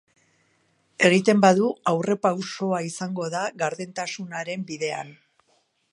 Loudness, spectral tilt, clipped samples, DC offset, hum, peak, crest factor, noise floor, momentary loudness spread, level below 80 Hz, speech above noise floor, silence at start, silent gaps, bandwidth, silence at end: -24 LUFS; -5 dB/octave; under 0.1%; under 0.1%; none; -2 dBFS; 22 dB; -67 dBFS; 14 LU; -74 dBFS; 44 dB; 1 s; none; 11 kHz; 0.8 s